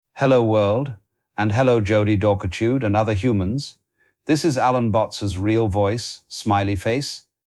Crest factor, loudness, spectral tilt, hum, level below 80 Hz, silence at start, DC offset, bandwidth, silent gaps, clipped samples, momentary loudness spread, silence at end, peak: 16 dB; -20 LUFS; -6.5 dB/octave; none; -46 dBFS; 0.15 s; under 0.1%; 12.5 kHz; none; under 0.1%; 11 LU; 0.3 s; -6 dBFS